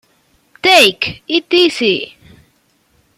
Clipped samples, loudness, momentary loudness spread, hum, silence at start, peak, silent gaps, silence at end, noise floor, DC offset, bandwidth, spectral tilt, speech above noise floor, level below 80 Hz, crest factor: under 0.1%; -12 LUFS; 12 LU; none; 0.65 s; 0 dBFS; none; 1.1 s; -58 dBFS; under 0.1%; 15 kHz; -2.5 dB/octave; 44 dB; -54 dBFS; 16 dB